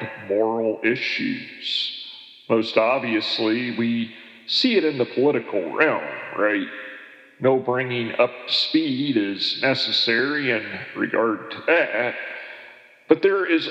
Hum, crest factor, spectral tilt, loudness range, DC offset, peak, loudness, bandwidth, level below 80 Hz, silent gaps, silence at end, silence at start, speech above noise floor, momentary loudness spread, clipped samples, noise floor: none; 22 dB; -5.5 dB/octave; 2 LU; under 0.1%; 0 dBFS; -22 LUFS; 8.4 kHz; -84 dBFS; none; 0 s; 0 s; 24 dB; 12 LU; under 0.1%; -46 dBFS